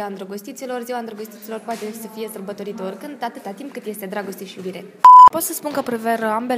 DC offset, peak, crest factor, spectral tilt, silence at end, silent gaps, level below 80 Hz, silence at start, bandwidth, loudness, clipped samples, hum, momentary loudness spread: under 0.1%; 0 dBFS; 18 dB; -4 dB/octave; 0 s; none; -64 dBFS; 0 s; 16 kHz; -12 LUFS; under 0.1%; none; 24 LU